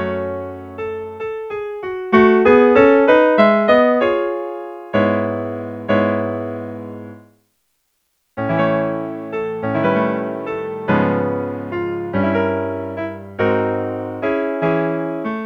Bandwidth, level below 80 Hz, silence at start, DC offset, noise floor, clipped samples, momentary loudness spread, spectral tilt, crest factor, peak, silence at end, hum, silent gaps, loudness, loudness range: 6.4 kHz; -52 dBFS; 0 s; under 0.1%; -68 dBFS; under 0.1%; 16 LU; -8.5 dB/octave; 18 dB; 0 dBFS; 0 s; none; none; -18 LUFS; 10 LU